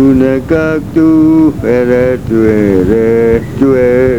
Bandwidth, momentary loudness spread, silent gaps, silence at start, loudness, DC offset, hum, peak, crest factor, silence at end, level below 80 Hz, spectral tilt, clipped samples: 14 kHz; 4 LU; none; 0 s; -9 LUFS; 2%; none; 0 dBFS; 8 dB; 0 s; -30 dBFS; -8.5 dB/octave; 0.5%